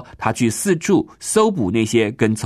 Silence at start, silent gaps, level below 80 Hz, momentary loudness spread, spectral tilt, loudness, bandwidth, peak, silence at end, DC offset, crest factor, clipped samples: 0 s; none; -52 dBFS; 3 LU; -5 dB/octave; -18 LUFS; 14 kHz; 0 dBFS; 0 s; under 0.1%; 18 dB; under 0.1%